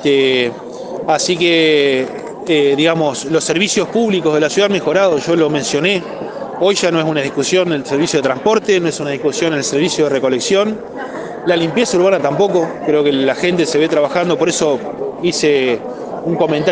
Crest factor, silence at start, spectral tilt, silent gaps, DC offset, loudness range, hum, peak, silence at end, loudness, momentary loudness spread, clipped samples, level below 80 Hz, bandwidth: 14 dB; 0 s; -4 dB/octave; none; under 0.1%; 2 LU; none; 0 dBFS; 0 s; -15 LUFS; 9 LU; under 0.1%; -56 dBFS; 10 kHz